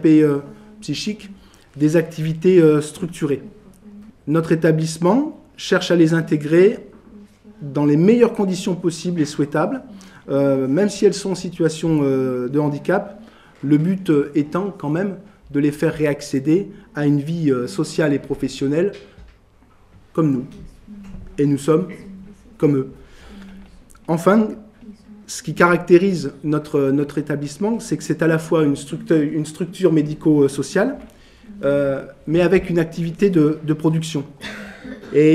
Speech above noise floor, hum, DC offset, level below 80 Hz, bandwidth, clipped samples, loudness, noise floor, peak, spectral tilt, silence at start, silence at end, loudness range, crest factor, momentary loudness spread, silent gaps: 33 dB; none; under 0.1%; -50 dBFS; 13.5 kHz; under 0.1%; -19 LUFS; -51 dBFS; 0 dBFS; -6.5 dB/octave; 0 s; 0 s; 5 LU; 18 dB; 15 LU; none